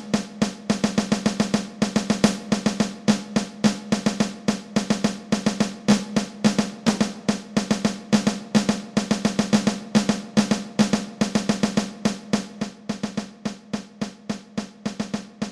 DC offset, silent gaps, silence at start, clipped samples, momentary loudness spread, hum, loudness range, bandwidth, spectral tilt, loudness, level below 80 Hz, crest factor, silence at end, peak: under 0.1%; none; 0 s; under 0.1%; 9 LU; none; 5 LU; 12.5 kHz; -5 dB/octave; -24 LUFS; -52 dBFS; 20 dB; 0 s; -4 dBFS